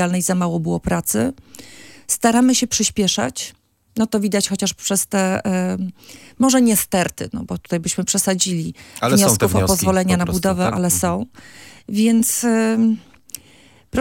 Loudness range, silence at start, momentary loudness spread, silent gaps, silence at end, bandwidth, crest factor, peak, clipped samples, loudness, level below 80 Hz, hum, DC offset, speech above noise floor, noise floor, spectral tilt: 2 LU; 0 s; 14 LU; none; 0 s; 17 kHz; 18 dB; -2 dBFS; under 0.1%; -18 LUFS; -46 dBFS; none; under 0.1%; 31 dB; -50 dBFS; -4 dB/octave